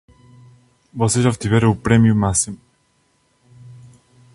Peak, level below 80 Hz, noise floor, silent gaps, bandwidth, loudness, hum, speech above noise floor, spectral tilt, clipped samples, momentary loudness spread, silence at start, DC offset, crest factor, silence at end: 0 dBFS; -42 dBFS; -62 dBFS; none; 11.5 kHz; -17 LUFS; none; 46 dB; -5.5 dB/octave; under 0.1%; 12 LU; 0.95 s; under 0.1%; 20 dB; 0.6 s